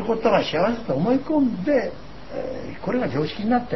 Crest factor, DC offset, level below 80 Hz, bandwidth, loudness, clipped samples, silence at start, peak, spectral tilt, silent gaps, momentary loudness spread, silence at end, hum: 18 dB; 1%; -48 dBFS; 6 kHz; -23 LUFS; under 0.1%; 0 s; -6 dBFS; -7.5 dB/octave; none; 12 LU; 0 s; none